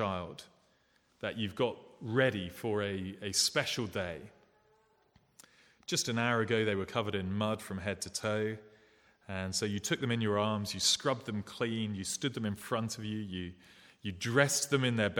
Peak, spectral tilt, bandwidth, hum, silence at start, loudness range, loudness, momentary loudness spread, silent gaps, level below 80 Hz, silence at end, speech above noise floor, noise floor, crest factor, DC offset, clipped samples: -10 dBFS; -3.5 dB/octave; 19 kHz; none; 0 s; 3 LU; -33 LUFS; 12 LU; none; -68 dBFS; 0 s; 37 dB; -71 dBFS; 24 dB; under 0.1%; under 0.1%